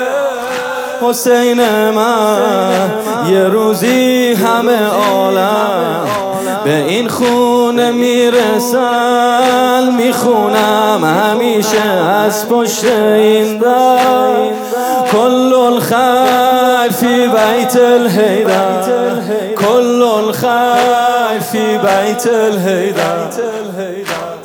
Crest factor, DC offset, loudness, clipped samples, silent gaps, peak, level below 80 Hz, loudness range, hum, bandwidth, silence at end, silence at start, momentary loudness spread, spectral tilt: 10 dB; under 0.1%; -11 LUFS; under 0.1%; none; 0 dBFS; -58 dBFS; 2 LU; none; 19 kHz; 0 s; 0 s; 6 LU; -4 dB/octave